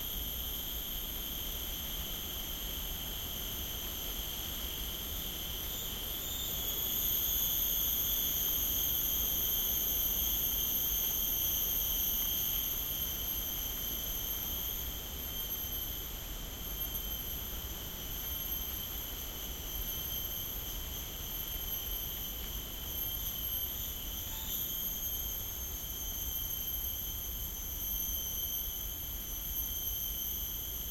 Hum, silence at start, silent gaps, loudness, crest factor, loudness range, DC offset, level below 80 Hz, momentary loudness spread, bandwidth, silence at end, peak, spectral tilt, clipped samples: none; 0 s; none; -34 LUFS; 16 dB; 8 LU; under 0.1%; -46 dBFS; 9 LU; 16.5 kHz; 0 s; -20 dBFS; -1.5 dB/octave; under 0.1%